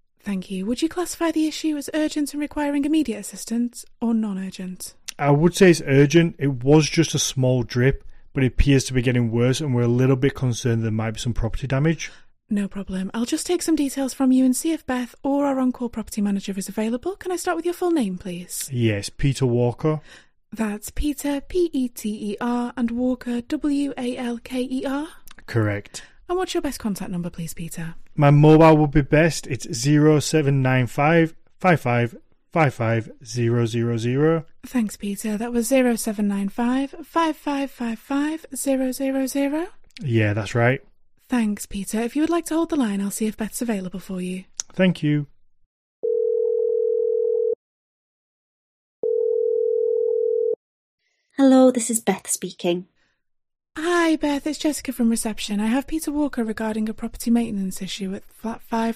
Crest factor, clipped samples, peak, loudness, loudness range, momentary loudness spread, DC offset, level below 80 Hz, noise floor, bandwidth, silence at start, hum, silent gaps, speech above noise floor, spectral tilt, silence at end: 18 dB; under 0.1%; -4 dBFS; -22 LUFS; 7 LU; 12 LU; under 0.1%; -40 dBFS; -67 dBFS; 15.5 kHz; 0.25 s; none; 45.66-46.03 s, 47.55-49.03 s, 50.56-50.98 s; 46 dB; -6 dB/octave; 0 s